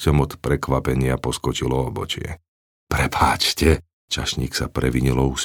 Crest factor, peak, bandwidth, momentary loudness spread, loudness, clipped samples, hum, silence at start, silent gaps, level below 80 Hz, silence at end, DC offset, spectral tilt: 20 dB; -2 dBFS; 20 kHz; 9 LU; -21 LUFS; under 0.1%; none; 0 s; 2.48-2.87 s, 3.93-4.08 s; -30 dBFS; 0 s; under 0.1%; -5 dB/octave